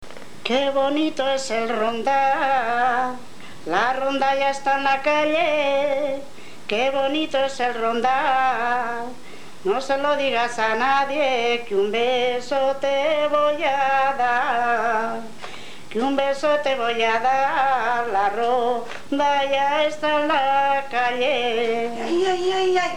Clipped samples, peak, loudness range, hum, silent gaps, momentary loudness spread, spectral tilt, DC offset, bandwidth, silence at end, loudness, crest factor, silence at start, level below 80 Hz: under 0.1%; -6 dBFS; 1 LU; none; none; 8 LU; -3 dB/octave; 2%; 14 kHz; 0 s; -21 LUFS; 16 dB; 0 s; -68 dBFS